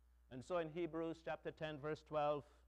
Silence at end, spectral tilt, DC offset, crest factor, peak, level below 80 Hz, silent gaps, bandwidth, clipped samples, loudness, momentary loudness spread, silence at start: 0.15 s; -6.5 dB/octave; under 0.1%; 16 dB; -28 dBFS; -70 dBFS; none; 10.5 kHz; under 0.1%; -45 LUFS; 7 LU; 0.3 s